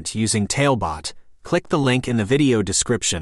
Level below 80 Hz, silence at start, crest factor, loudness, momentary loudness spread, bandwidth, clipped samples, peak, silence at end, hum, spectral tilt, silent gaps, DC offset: -44 dBFS; 0 s; 16 dB; -20 LUFS; 7 LU; 12.5 kHz; under 0.1%; -4 dBFS; 0 s; none; -4.5 dB/octave; none; under 0.1%